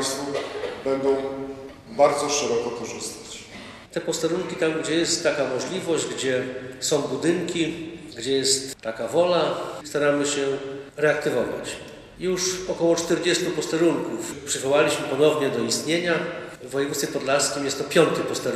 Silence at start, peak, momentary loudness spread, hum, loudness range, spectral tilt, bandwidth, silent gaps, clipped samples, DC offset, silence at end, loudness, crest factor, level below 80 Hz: 0 s; -4 dBFS; 12 LU; none; 3 LU; -3.5 dB/octave; 15 kHz; none; under 0.1%; under 0.1%; 0 s; -24 LUFS; 20 dB; -58 dBFS